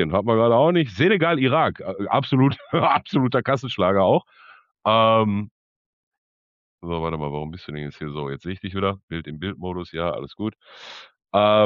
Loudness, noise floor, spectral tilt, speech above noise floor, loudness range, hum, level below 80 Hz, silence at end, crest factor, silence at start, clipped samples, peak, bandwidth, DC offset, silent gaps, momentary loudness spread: -22 LUFS; under -90 dBFS; -8 dB/octave; over 69 dB; 10 LU; none; -52 dBFS; 0 s; 16 dB; 0 s; under 0.1%; -6 dBFS; 7.4 kHz; under 0.1%; 5.51-6.11 s, 6.18-6.78 s, 9.03-9.08 s; 15 LU